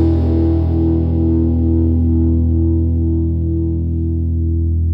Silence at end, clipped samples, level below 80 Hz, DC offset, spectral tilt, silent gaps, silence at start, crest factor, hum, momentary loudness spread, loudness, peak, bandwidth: 0 s; under 0.1%; -20 dBFS; under 0.1%; -13 dB/octave; none; 0 s; 10 dB; none; 4 LU; -16 LUFS; -4 dBFS; 1.6 kHz